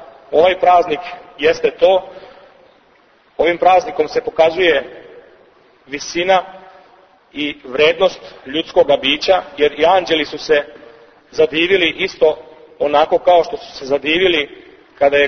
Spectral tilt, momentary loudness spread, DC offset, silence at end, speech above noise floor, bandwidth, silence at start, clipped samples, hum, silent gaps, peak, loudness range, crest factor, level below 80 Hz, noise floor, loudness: -3.5 dB/octave; 15 LU; under 0.1%; 0 s; 37 dB; 6.6 kHz; 0 s; under 0.1%; none; none; 0 dBFS; 4 LU; 16 dB; -50 dBFS; -52 dBFS; -15 LUFS